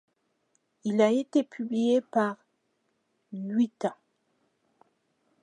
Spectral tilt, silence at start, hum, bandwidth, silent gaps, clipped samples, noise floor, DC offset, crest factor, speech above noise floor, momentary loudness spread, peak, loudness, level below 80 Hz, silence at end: -6.5 dB/octave; 0.85 s; none; 10 kHz; none; under 0.1%; -75 dBFS; under 0.1%; 20 dB; 49 dB; 13 LU; -10 dBFS; -28 LUFS; -84 dBFS; 1.5 s